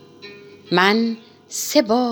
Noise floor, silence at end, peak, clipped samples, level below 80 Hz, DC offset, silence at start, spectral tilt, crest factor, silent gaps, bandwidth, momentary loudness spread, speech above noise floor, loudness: -41 dBFS; 0 s; 0 dBFS; under 0.1%; -70 dBFS; under 0.1%; 0.25 s; -3.5 dB/octave; 20 dB; none; over 20 kHz; 23 LU; 23 dB; -19 LUFS